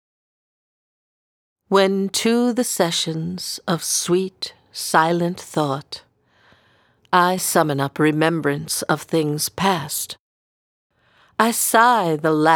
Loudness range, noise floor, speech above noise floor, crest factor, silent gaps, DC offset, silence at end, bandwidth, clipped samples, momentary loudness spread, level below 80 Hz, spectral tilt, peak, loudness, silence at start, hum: 3 LU; -58 dBFS; 39 dB; 20 dB; 10.19-10.90 s; under 0.1%; 0 s; over 20 kHz; under 0.1%; 12 LU; -64 dBFS; -4 dB/octave; 0 dBFS; -19 LUFS; 1.7 s; none